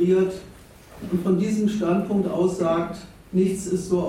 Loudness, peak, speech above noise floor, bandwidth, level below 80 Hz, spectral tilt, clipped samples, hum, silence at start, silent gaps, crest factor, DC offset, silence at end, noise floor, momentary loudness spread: -23 LUFS; -10 dBFS; 23 dB; 15 kHz; -52 dBFS; -7 dB/octave; under 0.1%; none; 0 s; none; 14 dB; under 0.1%; 0 s; -45 dBFS; 10 LU